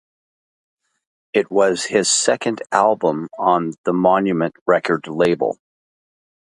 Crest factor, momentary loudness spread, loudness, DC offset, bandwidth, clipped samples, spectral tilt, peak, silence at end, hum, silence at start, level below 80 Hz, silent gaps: 20 dB; 6 LU; -18 LUFS; under 0.1%; 11.5 kHz; under 0.1%; -3.5 dB/octave; 0 dBFS; 1.05 s; none; 1.35 s; -62 dBFS; 3.78-3.84 s, 4.61-4.66 s